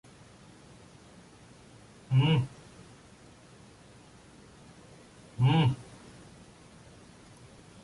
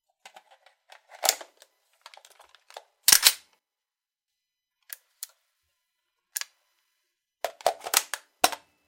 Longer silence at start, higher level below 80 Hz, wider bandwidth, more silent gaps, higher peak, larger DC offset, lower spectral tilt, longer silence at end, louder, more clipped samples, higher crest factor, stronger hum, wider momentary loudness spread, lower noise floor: first, 2.1 s vs 1.2 s; first, -62 dBFS vs -74 dBFS; second, 11.5 kHz vs 17 kHz; neither; second, -14 dBFS vs 0 dBFS; neither; first, -7 dB/octave vs 2.5 dB/octave; first, 2 s vs 0.3 s; second, -28 LUFS vs -23 LUFS; neither; second, 20 dB vs 32 dB; neither; first, 28 LU vs 25 LU; second, -55 dBFS vs under -90 dBFS